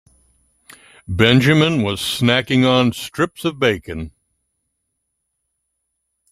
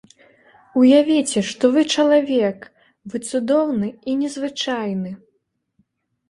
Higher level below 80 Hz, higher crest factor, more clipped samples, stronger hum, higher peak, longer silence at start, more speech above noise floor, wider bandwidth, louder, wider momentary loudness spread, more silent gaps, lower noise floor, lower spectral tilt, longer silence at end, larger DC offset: first, -48 dBFS vs -64 dBFS; about the same, 18 dB vs 16 dB; neither; neither; about the same, -2 dBFS vs -2 dBFS; first, 1.1 s vs 0.75 s; first, 58 dB vs 52 dB; first, 15 kHz vs 11.5 kHz; first, -16 LUFS vs -19 LUFS; about the same, 15 LU vs 15 LU; neither; first, -74 dBFS vs -70 dBFS; about the same, -5.5 dB/octave vs -4.5 dB/octave; first, 2.25 s vs 1.15 s; neither